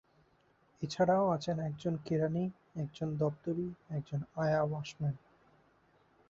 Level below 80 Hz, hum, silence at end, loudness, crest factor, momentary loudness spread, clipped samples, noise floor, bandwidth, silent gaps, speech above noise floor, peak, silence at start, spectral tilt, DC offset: -68 dBFS; none; 1.1 s; -35 LUFS; 18 dB; 12 LU; under 0.1%; -70 dBFS; 7.6 kHz; none; 36 dB; -18 dBFS; 0.8 s; -7 dB/octave; under 0.1%